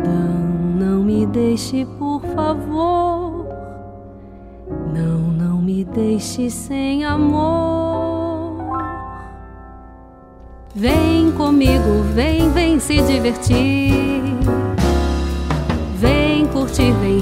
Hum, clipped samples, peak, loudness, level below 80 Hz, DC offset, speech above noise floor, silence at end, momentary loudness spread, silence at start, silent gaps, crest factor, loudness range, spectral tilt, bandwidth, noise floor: none; under 0.1%; -2 dBFS; -18 LUFS; -28 dBFS; under 0.1%; 25 dB; 0 s; 14 LU; 0 s; none; 16 dB; 7 LU; -6.5 dB/octave; 16 kHz; -40 dBFS